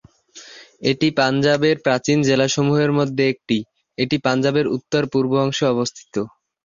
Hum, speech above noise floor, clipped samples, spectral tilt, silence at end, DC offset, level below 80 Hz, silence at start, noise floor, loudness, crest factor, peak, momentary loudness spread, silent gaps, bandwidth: none; 26 dB; under 0.1%; -5.5 dB/octave; 0.4 s; under 0.1%; -56 dBFS; 0.35 s; -44 dBFS; -19 LUFS; 18 dB; -2 dBFS; 11 LU; none; 7.6 kHz